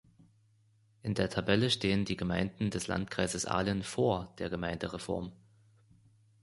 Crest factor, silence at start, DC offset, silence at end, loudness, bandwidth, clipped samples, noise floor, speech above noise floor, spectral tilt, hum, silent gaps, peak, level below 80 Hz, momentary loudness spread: 22 dB; 1.05 s; under 0.1%; 1.05 s; -33 LUFS; 11.5 kHz; under 0.1%; -68 dBFS; 35 dB; -5 dB/octave; none; none; -12 dBFS; -54 dBFS; 9 LU